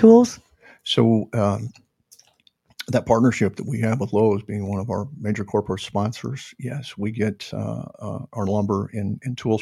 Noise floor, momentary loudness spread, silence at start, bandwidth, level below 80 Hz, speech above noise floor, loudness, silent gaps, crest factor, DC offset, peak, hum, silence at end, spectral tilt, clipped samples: -61 dBFS; 14 LU; 0 s; 12.5 kHz; -56 dBFS; 40 dB; -23 LUFS; none; 20 dB; under 0.1%; 0 dBFS; none; 0 s; -6.5 dB/octave; under 0.1%